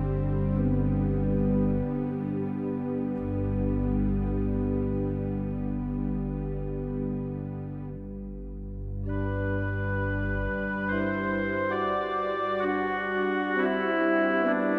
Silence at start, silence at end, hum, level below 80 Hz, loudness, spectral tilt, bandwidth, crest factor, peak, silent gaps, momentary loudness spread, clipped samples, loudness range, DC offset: 0 s; 0 s; 50 Hz at -45 dBFS; -38 dBFS; -29 LUFS; -10 dB/octave; 4.5 kHz; 14 dB; -14 dBFS; none; 9 LU; under 0.1%; 6 LU; under 0.1%